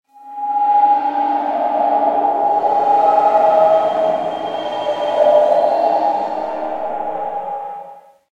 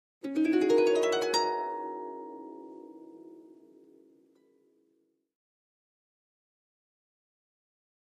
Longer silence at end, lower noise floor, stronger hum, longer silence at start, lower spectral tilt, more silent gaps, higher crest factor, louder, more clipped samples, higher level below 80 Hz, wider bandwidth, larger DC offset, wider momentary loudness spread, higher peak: second, 0.35 s vs 4.7 s; second, -38 dBFS vs -74 dBFS; neither; about the same, 0.15 s vs 0.25 s; first, -5.5 dB/octave vs -3 dB/octave; neither; second, 14 dB vs 20 dB; first, -16 LUFS vs -28 LUFS; neither; first, -68 dBFS vs -86 dBFS; second, 7.6 kHz vs 15 kHz; neither; second, 11 LU vs 25 LU; first, -2 dBFS vs -14 dBFS